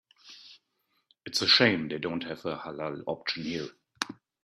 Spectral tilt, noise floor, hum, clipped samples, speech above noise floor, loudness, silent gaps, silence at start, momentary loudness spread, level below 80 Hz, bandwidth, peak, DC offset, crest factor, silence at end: -3.5 dB/octave; -76 dBFS; none; under 0.1%; 47 dB; -28 LUFS; none; 0.25 s; 25 LU; -70 dBFS; 14 kHz; -8 dBFS; under 0.1%; 24 dB; 0.3 s